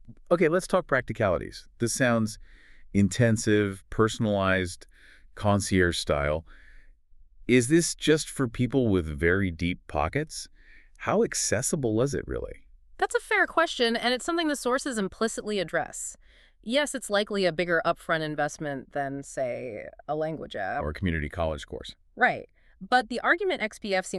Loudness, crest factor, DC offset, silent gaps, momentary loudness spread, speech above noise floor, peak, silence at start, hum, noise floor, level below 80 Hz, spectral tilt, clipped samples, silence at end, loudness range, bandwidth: -27 LUFS; 20 dB; under 0.1%; none; 11 LU; 26 dB; -8 dBFS; 0.05 s; none; -53 dBFS; -46 dBFS; -4.5 dB/octave; under 0.1%; 0 s; 4 LU; 13.5 kHz